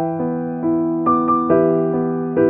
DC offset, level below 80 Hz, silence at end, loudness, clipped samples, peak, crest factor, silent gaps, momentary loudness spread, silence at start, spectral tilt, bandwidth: under 0.1%; -54 dBFS; 0 s; -18 LUFS; under 0.1%; -4 dBFS; 14 dB; none; 7 LU; 0 s; -13.5 dB/octave; 3 kHz